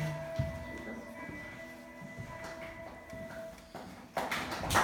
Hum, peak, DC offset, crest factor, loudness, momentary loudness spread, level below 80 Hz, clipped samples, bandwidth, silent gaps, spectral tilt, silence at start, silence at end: none; -14 dBFS; under 0.1%; 26 dB; -41 LUFS; 12 LU; -54 dBFS; under 0.1%; 19 kHz; none; -4 dB/octave; 0 s; 0 s